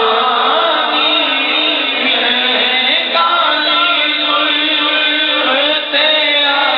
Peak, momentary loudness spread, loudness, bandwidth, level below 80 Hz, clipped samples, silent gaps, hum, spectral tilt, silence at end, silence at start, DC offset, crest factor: 0 dBFS; 2 LU; -11 LUFS; 5.6 kHz; -58 dBFS; under 0.1%; none; none; -6 dB/octave; 0 s; 0 s; under 0.1%; 12 dB